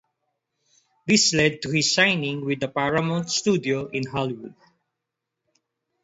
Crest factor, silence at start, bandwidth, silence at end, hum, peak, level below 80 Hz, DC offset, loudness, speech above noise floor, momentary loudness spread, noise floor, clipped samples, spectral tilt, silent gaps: 20 dB; 1.05 s; 8.2 kHz; 1.5 s; none; -6 dBFS; -60 dBFS; under 0.1%; -22 LUFS; 60 dB; 10 LU; -83 dBFS; under 0.1%; -3.5 dB/octave; none